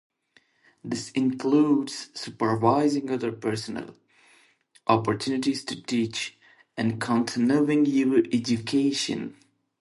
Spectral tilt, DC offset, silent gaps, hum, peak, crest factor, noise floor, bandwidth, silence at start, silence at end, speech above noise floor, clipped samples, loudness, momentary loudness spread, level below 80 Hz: -5.5 dB/octave; under 0.1%; none; none; -6 dBFS; 20 dB; -64 dBFS; 11.5 kHz; 0.85 s; 0.5 s; 39 dB; under 0.1%; -25 LUFS; 13 LU; -66 dBFS